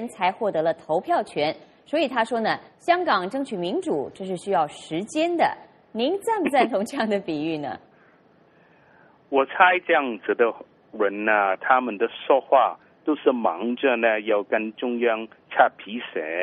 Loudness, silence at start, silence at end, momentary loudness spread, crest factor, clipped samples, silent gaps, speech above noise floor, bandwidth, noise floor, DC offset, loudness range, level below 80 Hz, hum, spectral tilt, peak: -23 LUFS; 0 s; 0 s; 10 LU; 22 dB; under 0.1%; none; 34 dB; 11.5 kHz; -57 dBFS; under 0.1%; 4 LU; -72 dBFS; none; -5 dB/octave; -2 dBFS